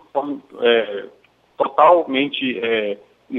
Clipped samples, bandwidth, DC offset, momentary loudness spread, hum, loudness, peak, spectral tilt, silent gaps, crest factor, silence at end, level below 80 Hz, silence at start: under 0.1%; 4.1 kHz; under 0.1%; 15 LU; none; -18 LUFS; -2 dBFS; -6.5 dB/octave; none; 18 dB; 0 s; -72 dBFS; 0.15 s